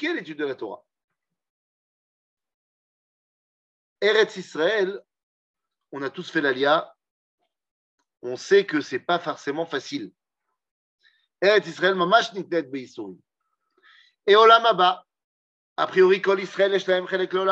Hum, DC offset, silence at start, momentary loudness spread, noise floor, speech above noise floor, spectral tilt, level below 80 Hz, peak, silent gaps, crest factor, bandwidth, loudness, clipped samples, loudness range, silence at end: none; under 0.1%; 0 s; 16 LU; -82 dBFS; 60 dB; -4.5 dB/octave; -84 dBFS; -2 dBFS; 1.04-1.08 s, 1.50-2.37 s, 2.54-3.96 s, 5.23-5.54 s, 7.11-7.38 s, 7.71-7.98 s, 10.71-10.98 s, 15.24-15.76 s; 24 dB; 8 kHz; -21 LUFS; under 0.1%; 8 LU; 0 s